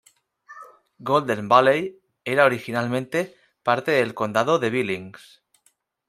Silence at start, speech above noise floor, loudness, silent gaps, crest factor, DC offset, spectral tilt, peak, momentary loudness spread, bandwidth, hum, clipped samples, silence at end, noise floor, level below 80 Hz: 0.5 s; 45 dB; -22 LUFS; none; 22 dB; under 0.1%; -5.5 dB/octave; -2 dBFS; 16 LU; 15.5 kHz; none; under 0.1%; 0.95 s; -66 dBFS; -70 dBFS